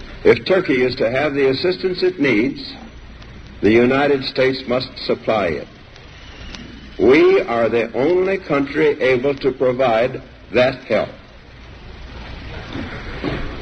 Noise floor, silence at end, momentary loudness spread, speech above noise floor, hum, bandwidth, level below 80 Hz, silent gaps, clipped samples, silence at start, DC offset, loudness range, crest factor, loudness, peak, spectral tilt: -40 dBFS; 0 s; 20 LU; 24 dB; none; 8 kHz; -40 dBFS; none; under 0.1%; 0 s; under 0.1%; 5 LU; 18 dB; -17 LUFS; 0 dBFS; -6.5 dB/octave